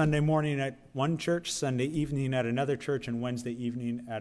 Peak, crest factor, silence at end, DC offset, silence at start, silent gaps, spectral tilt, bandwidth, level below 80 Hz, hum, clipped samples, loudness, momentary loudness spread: -16 dBFS; 14 dB; 0 s; under 0.1%; 0 s; none; -6 dB/octave; 11 kHz; -54 dBFS; none; under 0.1%; -31 LUFS; 7 LU